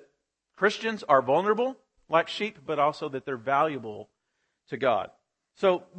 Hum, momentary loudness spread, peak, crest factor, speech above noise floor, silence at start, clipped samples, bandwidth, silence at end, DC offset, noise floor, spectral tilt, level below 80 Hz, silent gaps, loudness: none; 12 LU; -6 dBFS; 22 dB; 52 dB; 0.6 s; under 0.1%; 8.8 kHz; 0 s; under 0.1%; -78 dBFS; -5 dB/octave; -74 dBFS; none; -27 LUFS